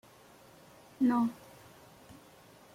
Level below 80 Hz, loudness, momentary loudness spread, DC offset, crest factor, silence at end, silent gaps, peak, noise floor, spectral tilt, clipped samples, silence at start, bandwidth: -74 dBFS; -31 LUFS; 28 LU; under 0.1%; 18 dB; 1.4 s; none; -18 dBFS; -58 dBFS; -6 dB/octave; under 0.1%; 1 s; 15.5 kHz